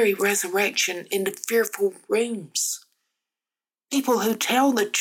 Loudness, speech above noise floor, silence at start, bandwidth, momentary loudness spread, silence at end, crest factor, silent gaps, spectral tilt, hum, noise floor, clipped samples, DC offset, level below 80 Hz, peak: -23 LUFS; over 67 dB; 0 s; 17.5 kHz; 7 LU; 0 s; 16 dB; none; -2 dB/octave; none; under -90 dBFS; under 0.1%; under 0.1%; -76 dBFS; -8 dBFS